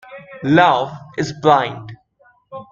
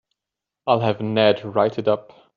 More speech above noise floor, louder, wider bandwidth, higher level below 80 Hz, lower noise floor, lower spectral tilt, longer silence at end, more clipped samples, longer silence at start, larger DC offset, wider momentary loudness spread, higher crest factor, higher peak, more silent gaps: second, 40 dB vs 66 dB; first, -16 LUFS vs -20 LUFS; first, 7.6 kHz vs 6.8 kHz; first, -56 dBFS vs -66 dBFS; second, -56 dBFS vs -86 dBFS; first, -6 dB/octave vs -4.5 dB/octave; second, 0.1 s vs 0.35 s; neither; second, 0.1 s vs 0.65 s; neither; first, 24 LU vs 6 LU; about the same, 18 dB vs 18 dB; first, 0 dBFS vs -4 dBFS; neither